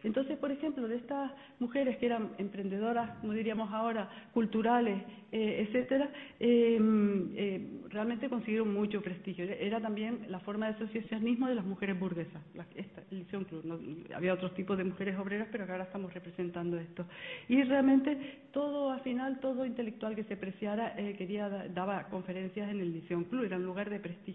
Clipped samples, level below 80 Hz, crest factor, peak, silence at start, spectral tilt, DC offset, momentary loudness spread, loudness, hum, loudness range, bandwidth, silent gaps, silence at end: under 0.1%; -72 dBFS; 18 dB; -16 dBFS; 0 s; -10 dB/octave; under 0.1%; 12 LU; -35 LUFS; none; 6 LU; 4 kHz; none; 0 s